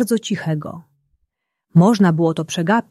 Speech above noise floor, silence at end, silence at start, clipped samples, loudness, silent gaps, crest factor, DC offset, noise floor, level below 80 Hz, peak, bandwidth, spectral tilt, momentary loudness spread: 56 dB; 0.1 s; 0 s; under 0.1%; -17 LUFS; none; 16 dB; under 0.1%; -72 dBFS; -60 dBFS; -2 dBFS; 13 kHz; -6.5 dB/octave; 11 LU